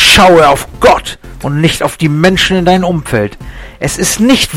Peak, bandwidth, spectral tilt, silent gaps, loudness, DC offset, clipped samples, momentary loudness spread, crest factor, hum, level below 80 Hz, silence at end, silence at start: 0 dBFS; over 20 kHz; -4 dB/octave; none; -9 LUFS; under 0.1%; 0.3%; 15 LU; 10 dB; none; -28 dBFS; 0 s; 0 s